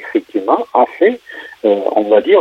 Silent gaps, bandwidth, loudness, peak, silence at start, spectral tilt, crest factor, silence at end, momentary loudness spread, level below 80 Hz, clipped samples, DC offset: none; 6 kHz; -14 LUFS; -2 dBFS; 0 s; -6.5 dB/octave; 12 dB; 0 s; 7 LU; -64 dBFS; under 0.1%; under 0.1%